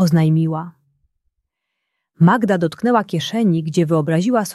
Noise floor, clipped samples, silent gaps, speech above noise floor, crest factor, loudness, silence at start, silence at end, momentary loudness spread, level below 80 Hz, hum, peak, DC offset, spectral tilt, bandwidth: -77 dBFS; under 0.1%; none; 61 dB; 16 dB; -17 LUFS; 0 s; 0 s; 7 LU; -60 dBFS; none; -2 dBFS; under 0.1%; -7 dB/octave; 13 kHz